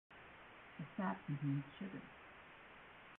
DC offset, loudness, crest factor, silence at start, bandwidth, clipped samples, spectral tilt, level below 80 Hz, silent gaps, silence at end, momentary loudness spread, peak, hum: under 0.1%; -45 LUFS; 18 dB; 0.1 s; 4 kHz; under 0.1%; -6.5 dB/octave; -76 dBFS; none; 0 s; 16 LU; -30 dBFS; none